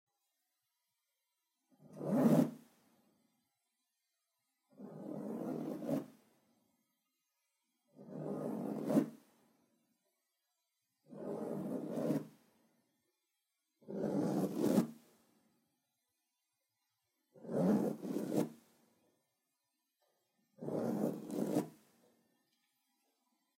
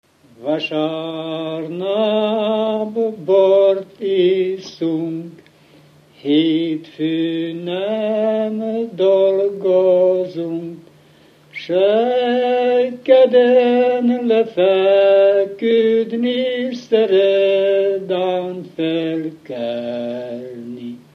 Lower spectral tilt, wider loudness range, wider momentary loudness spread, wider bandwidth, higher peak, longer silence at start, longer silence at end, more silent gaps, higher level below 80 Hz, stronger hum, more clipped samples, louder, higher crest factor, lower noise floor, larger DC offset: about the same, -7.5 dB/octave vs -7 dB/octave; about the same, 7 LU vs 7 LU; first, 17 LU vs 13 LU; first, 16 kHz vs 6.6 kHz; second, -18 dBFS vs 0 dBFS; first, 1.85 s vs 0.4 s; first, 1.85 s vs 0.15 s; neither; second, -88 dBFS vs -72 dBFS; neither; neither; second, -38 LUFS vs -17 LUFS; first, 24 dB vs 16 dB; first, -87 dBFS vs -49 dBFS; neither